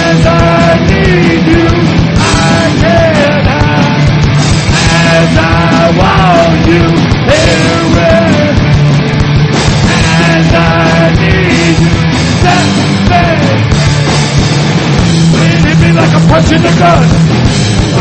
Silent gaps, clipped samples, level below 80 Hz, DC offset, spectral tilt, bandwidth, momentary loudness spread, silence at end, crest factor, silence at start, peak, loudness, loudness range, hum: none; 0.6%; -20 dBFS; under 0.1%; -5.5 dB/octave; 9.2 kHz; 2 LU; 0 s; 6 dB; 0 s; 0 dBFS; -7 LUFS; 1 LU; none